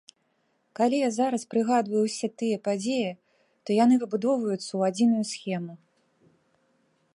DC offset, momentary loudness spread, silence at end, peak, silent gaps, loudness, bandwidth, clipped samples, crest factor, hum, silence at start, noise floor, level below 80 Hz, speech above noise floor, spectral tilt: under 0.1%; 10 LU; 1.4 s; -10 dBFS; none; -26 LUFS; 11 kHz; under 0.1%; 16 dB; none; 0.8 s; -72 dBFS; -80 dBFS; 46 dB; -5.5 dB/octave